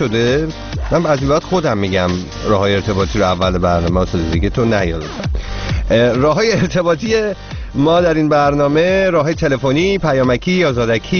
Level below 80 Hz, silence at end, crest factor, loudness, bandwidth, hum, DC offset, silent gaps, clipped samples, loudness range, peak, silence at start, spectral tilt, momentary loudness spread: -28 dBFS; 0 s; 14 dB; -15 LUFS; 6.8 kHz; none; under 0.1%; none; under 0.1%; 2 LU; -2 dBFS; 0 s; -5 dB/octave; 8 LU